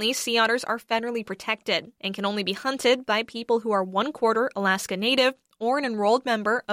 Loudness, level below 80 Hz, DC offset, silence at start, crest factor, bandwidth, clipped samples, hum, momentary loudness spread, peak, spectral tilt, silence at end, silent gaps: -24 LUFS; -72 dBFS; under 0.1%; 0 s; 16 dB; 16 kHz; under 0.1%; none; 6 LU; -8 dBFS; -3 dB/octave; 0 s; none